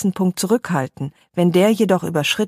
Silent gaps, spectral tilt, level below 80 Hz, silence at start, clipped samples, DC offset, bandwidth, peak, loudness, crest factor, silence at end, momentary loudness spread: none; -5.5 dB/octave; -60 dBFS; 0 s; under 0.1%; under 0.1%; 15.5 kHz; -4 dBFS; -18 LUFS; 14 dB; 0 s; 11 LU